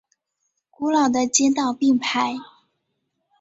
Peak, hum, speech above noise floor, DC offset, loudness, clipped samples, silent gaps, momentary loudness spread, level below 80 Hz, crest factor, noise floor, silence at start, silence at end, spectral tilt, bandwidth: -4 dBFS; none; 55 dB; under 0.1%; -20 LUFS; under 0.1%; none; 9 LU; -66 dBFS; 20 dB; -75 dBFS; 0.8 s; 0.95 s; -2 dB/octave; 8 kHz